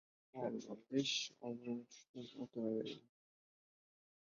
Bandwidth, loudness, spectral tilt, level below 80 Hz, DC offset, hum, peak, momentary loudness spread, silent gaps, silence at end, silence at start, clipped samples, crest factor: 7.4 kHz; -44 LUFS; -3.5 dB/octave; -88 dBFS; under 0.1%; none; -24 dBFS; 16 LU; 2.09-2.14 s; 1.3 s; 0.35 s; under 0.1%; 22 dB